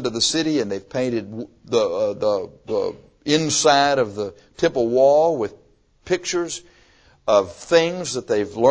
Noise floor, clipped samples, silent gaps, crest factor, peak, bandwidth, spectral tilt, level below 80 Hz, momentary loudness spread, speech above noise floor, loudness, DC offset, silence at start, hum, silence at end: -54 dBFS; under 0.1%; none; 18 dB; -2 dBFS; 8 kHz; -3.5 dB/octave; -56 dBFS; 14 LU; 34 dB; -20 LUFS; under 0.1%; 0 s; none; 0 s